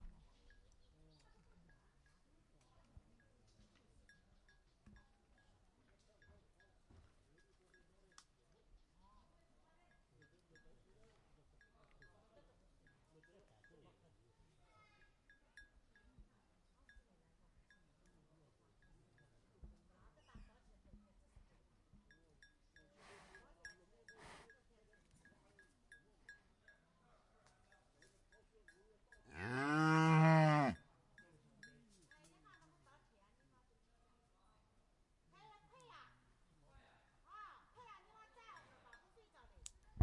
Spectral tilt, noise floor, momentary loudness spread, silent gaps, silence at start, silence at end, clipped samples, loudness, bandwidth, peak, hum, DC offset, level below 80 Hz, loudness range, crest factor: -7 dB/octave; -76 dBFS; 32 LU; none; 0 s; 0 s; under 0.1%; -35 LUFS; 11 kHz; -20 dBFS; none; under 0.1%; -72 dBFS; 27 LU; 28 dB